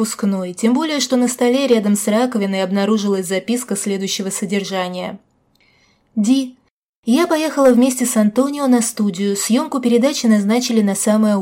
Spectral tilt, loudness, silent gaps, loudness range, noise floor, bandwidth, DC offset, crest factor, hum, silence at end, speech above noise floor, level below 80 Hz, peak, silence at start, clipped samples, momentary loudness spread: -4.5 dB/octave; -17 LUFS; 6.71-7.03 s; 6 LU; -57 dBFS; 16.5 kHz; under 0.1%; 14 dB; none; 0 s; 41 dB; -66 dBFS; -4 dBFS; 0 s; under 0.1%; 6 LU